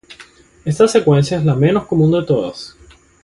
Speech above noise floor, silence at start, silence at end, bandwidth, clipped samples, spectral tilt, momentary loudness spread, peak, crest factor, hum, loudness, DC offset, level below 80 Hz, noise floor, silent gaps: 30 dB; 0.1 s; 0.55 s; 11.5 kHz; under 0.1%; -7 dB/octave; 14 LU; 0 dBFS; 16 dB; none; -15 LUFS; under 0.1%; -46 dBFS; -44 dBFS; none